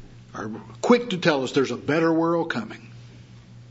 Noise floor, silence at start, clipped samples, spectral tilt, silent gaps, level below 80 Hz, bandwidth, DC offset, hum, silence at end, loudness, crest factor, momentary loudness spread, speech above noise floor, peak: -46 dBFS; 0 s; under 0.1%; -5.5 dB/octave; none; -60 dBFS; 8 kHz; under 0.1%; none; 0.05 s; -23 LUFS; 20 dB; 16 LU; 23 dB; -4 dBFS